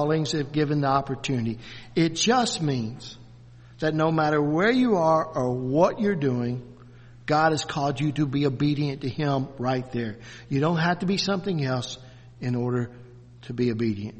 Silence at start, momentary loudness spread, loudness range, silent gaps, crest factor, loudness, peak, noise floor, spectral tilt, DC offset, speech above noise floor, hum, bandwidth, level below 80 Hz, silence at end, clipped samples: 0 s; 13 LU; 4 LU; none; 18 dB; -25 LUFS; -6 dBFS; -48 dBFS; -5.5 dB/octave; under 0.1%; 23 dB; none; 8.4 kHz; -56 dBFS; 0 s; under 0.1%